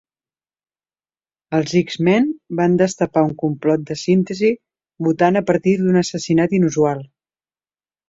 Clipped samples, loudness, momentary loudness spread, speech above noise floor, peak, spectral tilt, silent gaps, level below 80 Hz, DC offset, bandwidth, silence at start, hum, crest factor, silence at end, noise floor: under 0.1%; -18 LUFS; 6 LU; over 73 dB; -2 dBFS; -6.5 dB/octave; none; -58 dBFS; under 0.1%; 7.8 kHz; 1.5 s; none; 16 dB; 1.05 s; under -90 dBFS